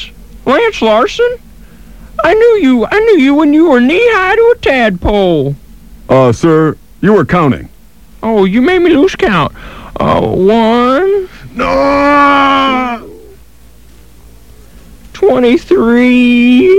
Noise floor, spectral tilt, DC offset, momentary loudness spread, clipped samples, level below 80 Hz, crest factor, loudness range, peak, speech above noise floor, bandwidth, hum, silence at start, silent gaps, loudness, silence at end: -39 dBFS; -6.5 dB/octave; 1%; 10 LU; under 0.1%; -32 dBFS; 10 dB; 4 LU; 0 dBFS; 32 dB; 12.5 kHz; none; 0 s; none; -9 LUFS; 0 s